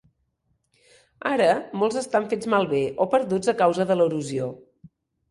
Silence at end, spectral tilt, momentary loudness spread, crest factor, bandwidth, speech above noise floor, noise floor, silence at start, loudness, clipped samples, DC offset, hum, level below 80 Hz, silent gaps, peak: 0.45 s; -5.5 dB/octave; 8 LU; 18 dB; 11.5 kHz; 49 dB; -72 dBFS; 1.25 s; -23 LUFS; under 0.1%; under 0.1%; none; -64 dBFS; none; -6 dBFS